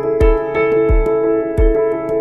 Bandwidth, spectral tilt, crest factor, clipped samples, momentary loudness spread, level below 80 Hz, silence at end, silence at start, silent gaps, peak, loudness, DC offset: 4.2 kHz; -9 dB/octave; 12 dB; under 0.1%; 2 LU; -18 dBFS; 0 s; 0 s; none; -2 dBFS; -15 LUFS; under 0.1%